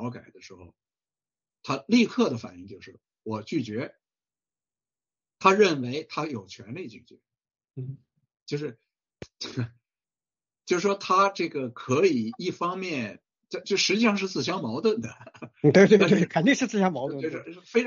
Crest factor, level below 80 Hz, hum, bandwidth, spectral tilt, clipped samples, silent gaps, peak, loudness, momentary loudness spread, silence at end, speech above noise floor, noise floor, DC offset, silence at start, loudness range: 22 dB; -70 dBFS; none; 7.4 kHz; -4.5 dB/octave; under 0.1%; 8.42-8.46 s; -4 dBFS; -25 LUFS; 20 LU; 0 s; over 65 dB; under -90 dBFS; under 0.1%; 0 s; 16 LU